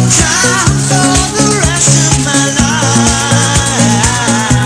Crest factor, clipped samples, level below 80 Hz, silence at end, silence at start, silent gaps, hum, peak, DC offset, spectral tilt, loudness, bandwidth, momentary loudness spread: 10 dB; 0.2%; -24 dBFS; 0 s; 0 s; none; none; 0 dBFS; under 0.1%; -3.5 dB/octave; -9 LUFS; 11 kHz; 3 LU